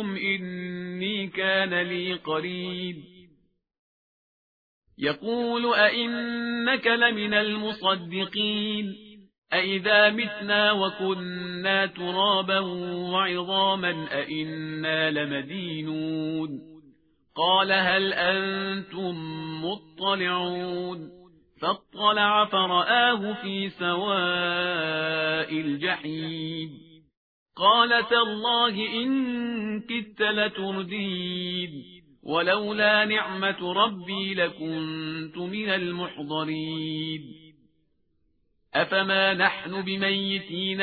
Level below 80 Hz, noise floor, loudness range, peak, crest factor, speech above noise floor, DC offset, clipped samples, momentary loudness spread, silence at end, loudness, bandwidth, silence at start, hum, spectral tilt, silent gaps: -68 dBFS; -71 dBFS; 6 LU; -6 dBFS; 22 dB; 45 dB; under 0.1%; under 0.1%; 12 LU; 0 s; -25 LUFS; 5 kHz; 0 s; none; -7.5 dB/octave; 3.79-4.82 s, 9.38-9.42 s, 27.17-27.46 s